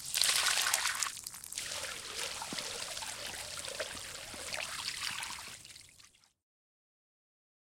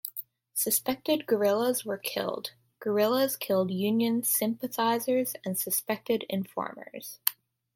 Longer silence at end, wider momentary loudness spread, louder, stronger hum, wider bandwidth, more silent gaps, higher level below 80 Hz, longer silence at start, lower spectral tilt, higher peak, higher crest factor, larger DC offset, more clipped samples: first, 1.7 s vs 0.4 s; first, 14 LU vs 11 LU; second, -35 LUFS vs -29 LUFS; neither; about the same, 17 kHz vs 17 kHz; neither; first, -68 dBFS vs -76 dBFS; about the same, 0 s vs 0.05 s; second, 1 dB/octave vs -3.5 dB/octave; second, -8 dBFS vs -2 dBFS; about the same, 30 dB vs 28 dB; neither; neither